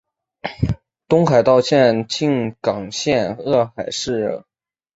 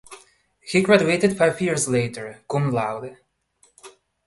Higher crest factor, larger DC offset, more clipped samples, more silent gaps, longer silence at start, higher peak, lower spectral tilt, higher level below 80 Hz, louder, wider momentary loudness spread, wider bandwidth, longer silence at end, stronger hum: second, 16 dB vs 22 dB; neither; neither; neither; first, 0.45 s vs 0.1 s; about the same, -2 dBFS vs -2 dBFS; about the same, -5.5 dB/octave vs -5 dB/octave; first, -44 dBFS vs -58 dBFS; first, -18 LUFS vs -21 LUFS; second, 11 LU vs 18 LU; second, 8 kHz vs 11.5 kHz; first, 0.55 s vs 0.35 s; neither